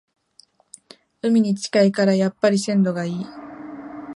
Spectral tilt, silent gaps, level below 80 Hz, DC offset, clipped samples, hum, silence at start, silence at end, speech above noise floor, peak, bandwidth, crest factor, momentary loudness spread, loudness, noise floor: -6 dB/octave; none; -68 dBFS; under 0.1%; under 0.1%; none; 1.25 s; 0.05 s; 37 dB; -6 dBFS; 11.5 kHz; 16 dB; 18 LU; -20 LUFS; -56 dBFS